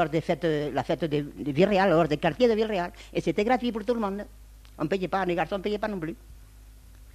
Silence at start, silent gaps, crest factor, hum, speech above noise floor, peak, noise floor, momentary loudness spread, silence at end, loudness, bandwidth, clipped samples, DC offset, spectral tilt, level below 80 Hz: 0 s; none; 20 dB; none; 23 dB; -8 dBFS; -49 dBFS; 10 LU; 0.05 s; -26 LUFS; 14 kHz; under 0.1%; under 0.1%; -6.5 dB/octave; -50 dBFS